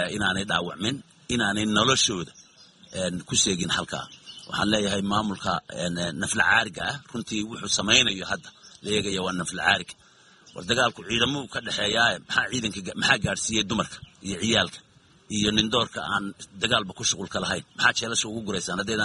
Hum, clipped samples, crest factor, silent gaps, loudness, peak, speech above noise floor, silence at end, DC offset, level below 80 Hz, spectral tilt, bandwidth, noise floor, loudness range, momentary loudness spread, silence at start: none; under 0.1%; 24 dB; none; -25 LUFS; -2 dBFS; 29 dB; 0 s; under 0.1%; -54 dBFS; -2.5 dB/octave; 11.5 kHz; -55 dBFS; 2 LU; 12 LU; 0 s